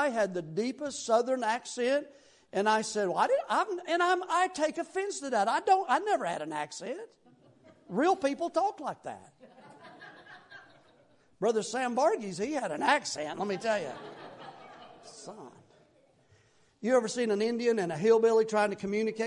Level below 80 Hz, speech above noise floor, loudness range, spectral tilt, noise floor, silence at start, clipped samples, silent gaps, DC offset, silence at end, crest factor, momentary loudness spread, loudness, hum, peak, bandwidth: -78 dBFS; 36 dB; 8 LU; -4 dB/octave; -65 dBFS; 0 s; under 0.1%; none; under 0.1%; 0 s; 18 dB; 21 LU; -30 LUFS; none; -12 dBFS; 11 kHz